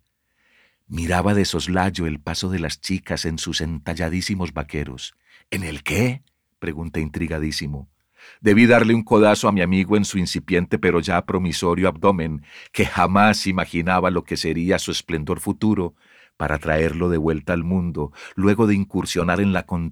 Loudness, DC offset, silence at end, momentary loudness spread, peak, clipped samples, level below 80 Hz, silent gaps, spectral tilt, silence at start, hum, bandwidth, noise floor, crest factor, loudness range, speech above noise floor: -21 LUFS; under 0.1%; 0 s; 13 LU; -2 dBFS; under 0.1%; -40 dBFS; none; -5.5 dB/octave; 0.9 s; none; 17 kHz; -67 dBFS; 18 dB; 8 LU; 46 dB